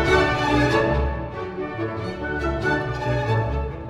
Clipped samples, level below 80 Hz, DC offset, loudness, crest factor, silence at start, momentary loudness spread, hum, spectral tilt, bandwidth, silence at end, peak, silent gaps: under 0.1%; -32 dBFS; under 0.1%; -23 LUFS; 16 dB; 0 s; 10 LU; none; -6.5 dB/octave; 12 kHz; 0 s; -6 dBFS; none